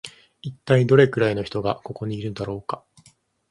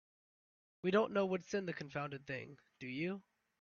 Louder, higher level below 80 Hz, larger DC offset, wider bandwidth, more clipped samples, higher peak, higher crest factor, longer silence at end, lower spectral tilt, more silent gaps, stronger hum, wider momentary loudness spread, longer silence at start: first, -22 LUFS vs -39 LUFS; first, -54 dBFS vs -78 dBFS; neither; first, 11.5 kHz vs 7 kHz; neither; first, 0 dBFS vs -20 dBFS; about the same, 22 dB vs 22 dB; first, 0.75 s vs 0.4 s; first, -7.5 dB/octave vs -5 dB/octave; neither; neither; first, 20 LU vs 14 LU; second, 0.05 s vs 0.85 s